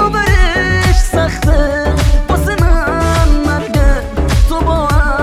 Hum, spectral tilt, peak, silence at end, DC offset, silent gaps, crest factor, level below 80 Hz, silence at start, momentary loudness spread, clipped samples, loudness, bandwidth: none; -5.5 dB/octave; -2 dBFS; 0 s; under 0.1%; none; 10 dB; -12 dBFS; 0 s; 3 LU; under 0.1%; -13 LUFS; 14.5 kHz